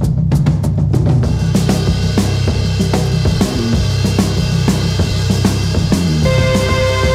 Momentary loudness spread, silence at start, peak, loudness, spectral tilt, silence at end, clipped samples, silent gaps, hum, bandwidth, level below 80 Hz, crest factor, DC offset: 2 LU; 0 s; 0 dBFS; -14 LUFS; -6 dB/octave; 0 s; under 0.1%; none; none; 15.5 kHz; -22 dBFS; 12 dB; under 0.1%